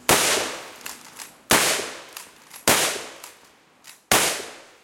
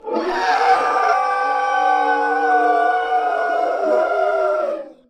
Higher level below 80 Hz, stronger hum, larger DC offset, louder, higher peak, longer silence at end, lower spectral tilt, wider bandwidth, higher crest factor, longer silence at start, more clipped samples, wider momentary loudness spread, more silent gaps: first, -54 dBFS vs -60 dBFS; neither; neither; about the same, -20 LUFS vs -18 LUFS; about the same, -2 dBFS vs -4 dBFS; about the same, 0.25 s vs 0.15 s; second, -1 dB/octave vs -2.5 dB/octave; first, 17 kHz vs 9.8 kHz; first, 24 dB vs 14 dB; about the same, 0.1 s vs 0.05 s; neither; first, 22 LU vs 4 LU; neither